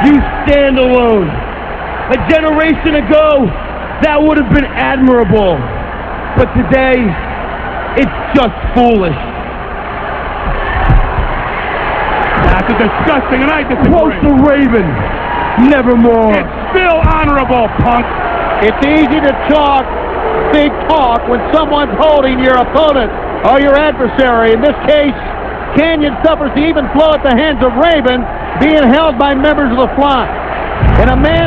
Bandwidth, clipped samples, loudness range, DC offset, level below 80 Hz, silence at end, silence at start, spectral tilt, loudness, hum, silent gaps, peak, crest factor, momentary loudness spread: 7.6 kHz; 0.4%; 4 LU; 0.6%; -20 dBFS; 0 s; 0 s; -8.5 dB/octave; -10 LUFS; none; none; 0 dBFS; 10 dB; 9 LU